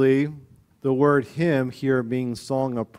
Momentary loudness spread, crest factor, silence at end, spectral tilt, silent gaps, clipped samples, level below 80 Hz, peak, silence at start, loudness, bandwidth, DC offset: 8 LU; 16 dB; 0.15 s; -7.5 dB/octave; none; under 0.1%; -60 dBFS; -6 dBFS; 0 s; -23 LUFS; 13.5 kHz; under 0.1%